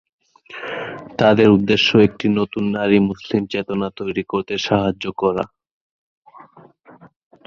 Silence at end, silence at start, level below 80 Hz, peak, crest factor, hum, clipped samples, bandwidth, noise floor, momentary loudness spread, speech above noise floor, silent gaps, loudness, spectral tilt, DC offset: 0.4 s; 0.5 s; -50 dBFS; 0 dBFS; 18 dB; none; under 0.1%; 7 kHz; -47 dBFS; 15 LU; 30 dB; 5.71-6.22 s; -18 LUFS; -6.5 dB/octave; under 0.1%